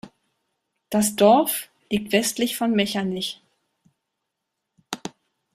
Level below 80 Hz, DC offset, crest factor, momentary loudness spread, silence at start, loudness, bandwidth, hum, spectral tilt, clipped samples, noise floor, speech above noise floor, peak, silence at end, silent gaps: -64 dBFS; under 0.1%; 22 dB; 18 LU; 0.05 s; -22 LUFS; 15.5 kHz; none; -4 dB/octave; under 0.1%; -81 dBFS; 60 dB; -4 dBFS; 0.45 s; none